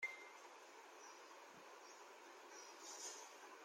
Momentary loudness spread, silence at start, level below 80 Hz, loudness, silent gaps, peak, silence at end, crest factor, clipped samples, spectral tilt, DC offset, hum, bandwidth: 9 LU; 0 s; under -90 dBFS; -56 LUFS; none; -36 dBFS; 0 s; 22 dB; under 0.1%; 0.5 dB/octave; under 0.1%; none; 16.5 kHz